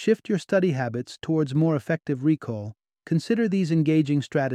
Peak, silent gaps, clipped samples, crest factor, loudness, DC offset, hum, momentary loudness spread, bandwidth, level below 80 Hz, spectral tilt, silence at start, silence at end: -8 dBFS; none; under 0.1%; 16 dB; -24 LUFS; under 0.1%; none; 9 LU; 10 kHz; -66 dBFS; -7.5 dB/octave; 0 s; 0 s